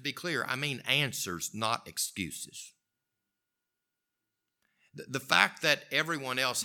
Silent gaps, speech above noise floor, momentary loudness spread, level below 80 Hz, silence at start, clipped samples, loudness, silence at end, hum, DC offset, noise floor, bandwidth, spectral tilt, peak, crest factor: none; 55 dB; 15 LU; -74 dBFS; 0 s; under 0.1%; -30 LUFS; 0 s; none; under 0.1%; -87 dBFS; 19 kHz; -2 dB/octave; -4 dBFS; 28 dB